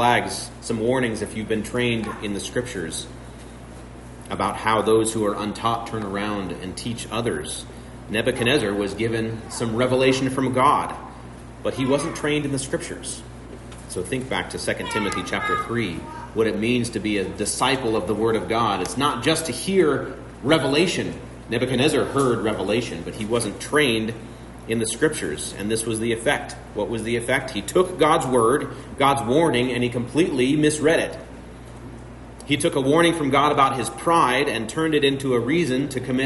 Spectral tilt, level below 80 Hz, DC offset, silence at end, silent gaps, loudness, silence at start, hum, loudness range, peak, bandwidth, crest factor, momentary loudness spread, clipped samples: -4.5 dB/octave; -46 dBFS; under 0.1%; 0 s; none; -22 LUFS; 0 s; none; 6 LU; -4 dBFS; 11.5 kHz; 18 dB; 16 LU; under 0.1%